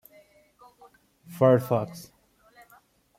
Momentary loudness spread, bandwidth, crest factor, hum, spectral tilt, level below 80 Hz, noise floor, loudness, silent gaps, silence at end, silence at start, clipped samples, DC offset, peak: 25 LU; 16.5 kHz; 22 dB; none; -8 dB/octave; -70 dBFS; -60 dBFS; -24 LUFS; none; 1.15 s; 1.3 s; under 0.1%; under 0.1%; -8 dBFS